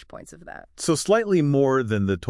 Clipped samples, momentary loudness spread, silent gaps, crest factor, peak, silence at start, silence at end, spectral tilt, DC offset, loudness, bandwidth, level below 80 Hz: under 0.1%; 22 LU; none; 14 dB; -8 dBFS; 0.15 s; 0 s; -5.5 dB/octave; under 0.1%; -21 LUFS; 12 kHz; -54 dBFS